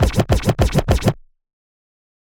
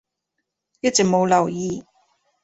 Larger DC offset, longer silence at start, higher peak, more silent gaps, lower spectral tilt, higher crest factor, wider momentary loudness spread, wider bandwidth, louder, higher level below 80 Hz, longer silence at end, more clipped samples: neither; second, 0 s vs 0.85 s; first, 0 dBFS vs -4 dBFS; neither; first, -6 dB/octave vs -4 dB/octave; about the same, 18 dB vs 20 dB; second, 5 LU vs 11 LU; first, 19.5 kHz vs 8.2 kHz; about the same, -18 LUFS vs -20 LUFS; first, -26 dBFS vs -58 dBFS; first, 1.15 s vs 0.6 s; neither